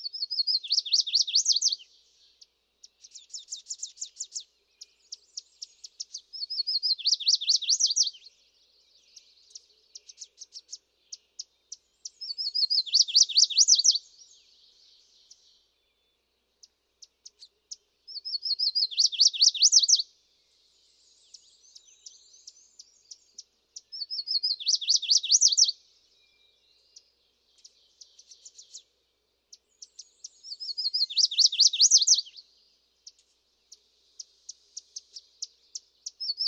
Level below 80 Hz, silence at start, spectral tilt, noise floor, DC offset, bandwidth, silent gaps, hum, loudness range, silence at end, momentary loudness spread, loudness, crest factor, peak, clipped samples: -86 dBFS; 0 s; 8 dB/octave; -75 dBFS; under 0.1%; 16 kHz; none; none; 18 LU; 0 s; 26 LU; -22 LUFS; 24 dB; -6 dBFS; under 0.1%